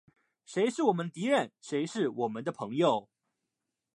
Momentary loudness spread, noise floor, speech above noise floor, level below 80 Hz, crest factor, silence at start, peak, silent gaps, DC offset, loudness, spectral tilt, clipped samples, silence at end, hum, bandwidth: 7 LU; -86 dBFS; 56 dB; -84 dBFS; 20 dB; 0.5 s; -12 dBFS; none; under 0.1%; -31 LUFS; -5.5 dB/octave; under 0.1%; 0.95 s; none; 11.5 kHz